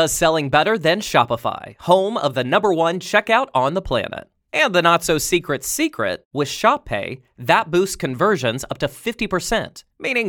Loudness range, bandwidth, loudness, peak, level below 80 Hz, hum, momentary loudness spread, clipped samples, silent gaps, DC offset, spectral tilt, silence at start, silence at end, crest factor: 2 LU; 19 kHz; -19 LUFS; 0 dBFS; -44 dBFS; none; 9 LU; under 0.1%; 6.25-6.31 s; under 0.1%; -3.5 dB/octave; 0 s; 0 s; 18 dB